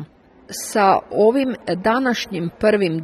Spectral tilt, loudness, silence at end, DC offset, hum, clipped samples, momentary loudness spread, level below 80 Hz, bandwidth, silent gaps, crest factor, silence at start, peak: -5 dB/octave; -18 LUFS; 0 s; under 0.1%; none; under 0.1%; 9 LU; -54 dBFS; 13 kHz; none; 16 dB; 0 s; -2 dBFS